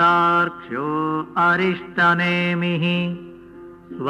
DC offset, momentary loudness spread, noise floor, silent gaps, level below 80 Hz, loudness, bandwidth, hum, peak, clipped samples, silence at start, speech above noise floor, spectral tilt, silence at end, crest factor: under 0.1%; 10 LU; -41 dBFS; none; -60 dBFS; -19 LUFS; 7.4 kHz; none; -6 dBFS; under 0.1%; 0 s; 21 dB; -7 dB/octave; 0 s; 14 dB